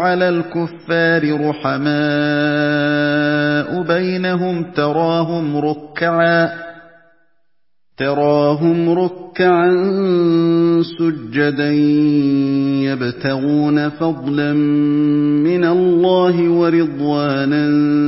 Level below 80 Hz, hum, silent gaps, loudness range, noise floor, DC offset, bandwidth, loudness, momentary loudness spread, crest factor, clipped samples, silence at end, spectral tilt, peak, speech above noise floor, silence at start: -60 dBFS; none; none; 4 LU; -76 dBFS; 0.2%; 5.8 kHz; -16 LUFS; 6 LU; 14 dB; under 0.1%; 0 s; -11 dB/octave; -2 dBFS; 61 dB; 0 s